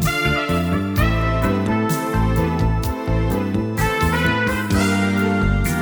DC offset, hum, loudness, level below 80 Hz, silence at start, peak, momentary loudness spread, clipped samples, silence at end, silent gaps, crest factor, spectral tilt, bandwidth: under 0.1%; none; -19 LUFS; -28 dBFS; 0 s; -4 dBFS; 3 LU; under 0.1%; 0 s; none; 14 dB; -6 dB/octave; over 20 kHz